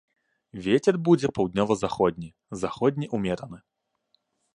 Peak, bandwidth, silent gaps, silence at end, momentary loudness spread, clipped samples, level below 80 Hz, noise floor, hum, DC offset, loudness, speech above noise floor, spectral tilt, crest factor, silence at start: -8 dBFS; 11 kHz; none; 1 s; 16 LU; under 0.1%; -56 dBFS; -72 dBFS; none; under 0.1%; -25 LUFS; 47 dB; -6.5 dB/octave; 18 dB; 0.55 s